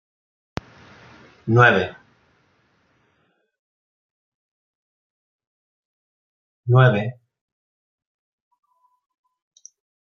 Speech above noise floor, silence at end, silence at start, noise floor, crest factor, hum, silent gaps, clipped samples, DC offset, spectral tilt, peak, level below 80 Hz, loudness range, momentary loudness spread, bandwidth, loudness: 52 dB; 2.9 s; 1.45 s; -67 dBFS; 24 dB; none; 3.59-5.39 s, 5.47-6.64 s; under 0.1%; under 0.1%; -7.5 dB/octave; -2 dBFS; -62 dBFS; 5 LU; 21 LU; 6.8 kHz; -18 LUFS